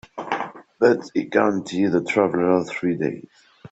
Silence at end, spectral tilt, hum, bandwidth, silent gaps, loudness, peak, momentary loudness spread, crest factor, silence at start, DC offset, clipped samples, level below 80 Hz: 0.05 s; -6.5 dB/octave; none; 8.2 kHz; none; -22 LUFS; -2 dBFS; 9 LU; 20 dB; 0.15 s; under 0.1%; under 0.1%; -64 dBFS